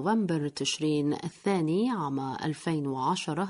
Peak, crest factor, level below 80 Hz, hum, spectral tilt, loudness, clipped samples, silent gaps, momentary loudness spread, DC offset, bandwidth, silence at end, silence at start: -14 dBFS; 14 dB; -70 dBFS; none; -5.5 dB/octave; -29 LUFS; under 0.1%; none; 5 LU; under 0.1%; 11 kHz; 0 s; 0 s